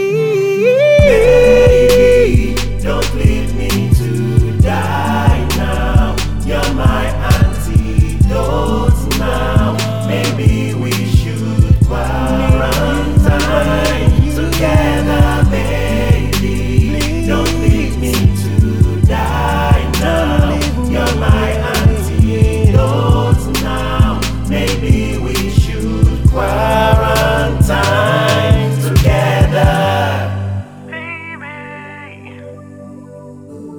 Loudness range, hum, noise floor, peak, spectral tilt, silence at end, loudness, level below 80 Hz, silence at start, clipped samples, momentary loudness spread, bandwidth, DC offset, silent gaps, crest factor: 3 LU; none; -33 dBFS; 0 dBFS; -6 dB/octave; 0 s; -13 LUFS; -18 dBFS; 0 s; under 0.1%; 8 LU; 20 kHz; 4%; none; 12 dB